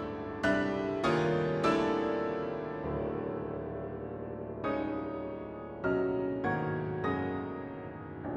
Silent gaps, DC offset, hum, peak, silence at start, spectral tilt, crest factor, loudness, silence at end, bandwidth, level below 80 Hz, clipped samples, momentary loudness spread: none; under 0.1%; none; -16 dBFS; 0 s; -7 dB/octave; 18 dB; -34 LUFS; 0 s; 10.5 kHz; -56 dBFS; under 0.1%; 11 LU